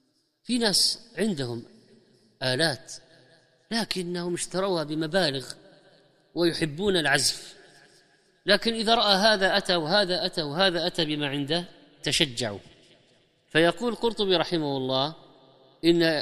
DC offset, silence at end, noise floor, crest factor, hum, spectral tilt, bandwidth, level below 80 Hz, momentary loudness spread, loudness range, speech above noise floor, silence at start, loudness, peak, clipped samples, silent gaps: under 0.1%; 0 s; -63 dBFS; 24 dB; none; -3.5 dB/octave; 14.5 kHz; -56 dBFS; 13 LU; 6 LU; 38 dB; 0.5 s; -25 LUFS; -4 dBFS; under 0.1%; none